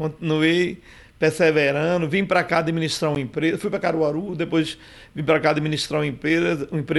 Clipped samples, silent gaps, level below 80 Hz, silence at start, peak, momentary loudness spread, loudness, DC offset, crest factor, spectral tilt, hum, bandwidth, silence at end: under 0.1%; none; -54 dBFS; 0 s; -8 dBFS; 8 LU; -21 LUFS; under 0.1%; 14 dB; -5.5 dB/octave; none; 12.5 kHz; 0 s